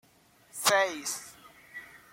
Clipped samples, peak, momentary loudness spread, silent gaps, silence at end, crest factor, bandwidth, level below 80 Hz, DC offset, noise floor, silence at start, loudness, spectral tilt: under 0.1%; -10 dBFS; 21 LU; none; 0.15 s; 22 dB; 16.5 kHz; -76 dBFS; under 0.1%; -62 dBFS; 0.55 s; -28 LUFS; -0.5 dB/octave